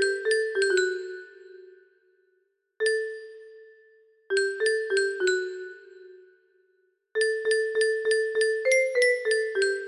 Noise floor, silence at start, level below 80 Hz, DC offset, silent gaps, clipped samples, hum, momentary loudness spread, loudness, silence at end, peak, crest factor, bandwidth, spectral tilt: -72 dBFS; 0 s; -76 dBFS; under 0.1%; none; under 0.1%; none; 17 LU; -25 LUFS; 0 s; -10 dBFS; 16 dB; 11.5 kHz; -0.5 dB/octave